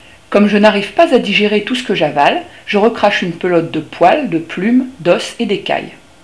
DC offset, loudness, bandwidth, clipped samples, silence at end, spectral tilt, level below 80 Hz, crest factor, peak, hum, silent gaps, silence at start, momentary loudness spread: 0.3%; -13 LUFS; 11 kHz; 0.4%; 0.3 s; -5.5 dB/octave; -52 dBFS; 14 dB; 0 dBFS; none; none; 0.3 s; 7 LU